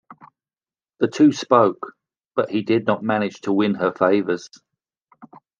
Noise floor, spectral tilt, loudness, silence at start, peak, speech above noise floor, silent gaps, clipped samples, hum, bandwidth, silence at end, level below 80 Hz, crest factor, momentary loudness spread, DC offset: under -90 dBFS; -6 dB/octave; -20 LUFS; 0.1 s; -2 dBFS; over 71 dB; none; under 0.1%; none; 7.4 kHz; 0.35 s; -72 dBFS; 20 dB; 10 LU; under 0.1%